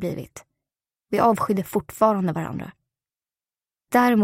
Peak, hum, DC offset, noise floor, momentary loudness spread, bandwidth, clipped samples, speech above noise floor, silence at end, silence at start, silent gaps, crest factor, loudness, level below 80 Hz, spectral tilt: -4 dBFS; none; under 0.1%; under -90 dBFS; 15 LU; 16 kHz; under 0.1%; over 69 dB; 0 s; 0 s; none; 20 dB; -22 LUFS; -58 dBFS; -6.5 dB/octave